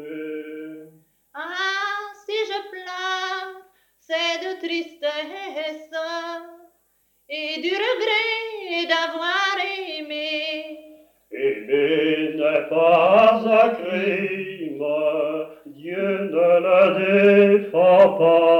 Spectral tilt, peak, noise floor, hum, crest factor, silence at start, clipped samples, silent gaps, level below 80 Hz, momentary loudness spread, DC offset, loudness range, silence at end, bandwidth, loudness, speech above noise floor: -5 dB/octave; -2 dBFS; -65 dBFS; none; 18 dB; 0 s; under 0.1%; none; -70 dBFS; 17 LU; under 0.1%; 9 LU; 0 s; 16.5 kHz; -20 LUFS; 49 dB